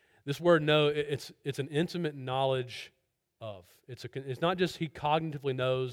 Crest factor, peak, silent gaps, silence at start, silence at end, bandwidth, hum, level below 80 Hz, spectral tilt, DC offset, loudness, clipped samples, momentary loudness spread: 20 dB; -12 dBFS; none; 0.25 s; 0 s; 16.5 kHz; none; -66 dBFS; -6 dB/octave; under 0.1%; -31 LUFS; under 0.1%; 19 LU